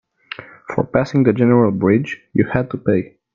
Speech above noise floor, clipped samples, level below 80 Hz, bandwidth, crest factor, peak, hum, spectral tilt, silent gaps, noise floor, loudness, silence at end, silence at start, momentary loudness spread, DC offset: 20 dB; under 0.1%; -48 dBFS; 7.2 kHz; 16 dB; 0 dBFS; none; -9 dB/octave; none; -36 dBFS; -17 LUFS; 0.3 s; 0.4 s; 19 LU; under 0.1%